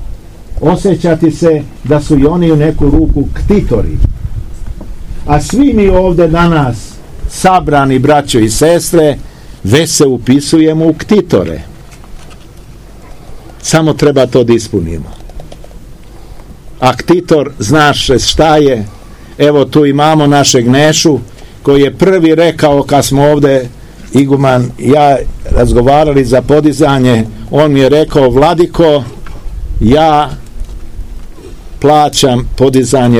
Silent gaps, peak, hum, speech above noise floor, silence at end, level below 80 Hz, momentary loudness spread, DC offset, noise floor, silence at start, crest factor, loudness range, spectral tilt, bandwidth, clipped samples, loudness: none; 0 dBFS; none; 24 dB; 0 s; -22 dBFS; 16 LU; 0.8%; -32 dBFS; 0 s; 8 dB; 5 LU; -5.5 dB/octave; 18 kHz; 4%; -8 LUFS